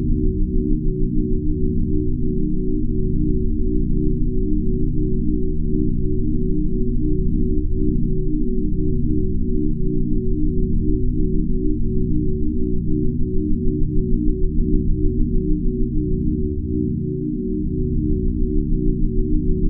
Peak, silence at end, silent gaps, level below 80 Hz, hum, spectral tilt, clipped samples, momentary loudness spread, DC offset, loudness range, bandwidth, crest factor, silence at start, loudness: -4 dBFS; 0 s; none; -20 dBFS; none; -23.5 dB/octave; under 0.1%; 2 LU; under 0.1%; 0 LU; 0.4 kHz; 14 dB; 0 s; -23 LUFS